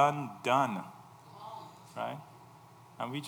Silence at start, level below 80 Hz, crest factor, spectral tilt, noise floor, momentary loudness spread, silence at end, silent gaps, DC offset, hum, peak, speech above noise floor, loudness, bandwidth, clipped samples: 0 s; -84 dBFS; 24 dB; -5.5 dB/octave; -56 dBFS; 26 LU; 0 s; none; under 0.1%; none; -10 dBFS; 24 dB; -33 LUFS; over 20 kHz; under 0.1%